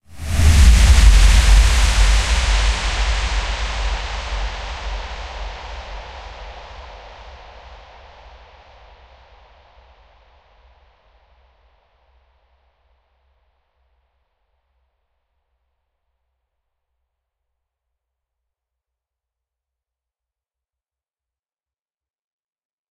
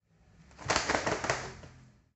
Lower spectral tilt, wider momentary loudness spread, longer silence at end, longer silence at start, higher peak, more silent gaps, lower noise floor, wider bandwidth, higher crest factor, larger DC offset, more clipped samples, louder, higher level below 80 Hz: about the same, -3.5 dB/octave vs -2.5 dB/octave; first, 26 LU vs 16 LU; first, 15.15 s vs 0.3 s; second, 0.1 s vs 0.4 s; first, 0 dBFS vs -10 dBFS; neither; first, under -90 dBFS vs -61 dBFS; first, 13 kHz vs 8.4 kHz; second, 20 dB vs 26 dB; neither; neither; first, -17 LUFS vs -31 LUFS; first, -20 dBFS vs -54 dBFS